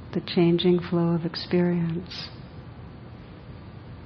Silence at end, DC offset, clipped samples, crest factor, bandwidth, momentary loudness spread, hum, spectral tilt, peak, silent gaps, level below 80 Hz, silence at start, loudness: 0 s; under 0.1%; under 0.1%; 16 dB; 6 kHz; 21 LU; none; -8.5 dB/octave; -10 dBFS; none; -52 dBFS; 0 s; -25 LUFS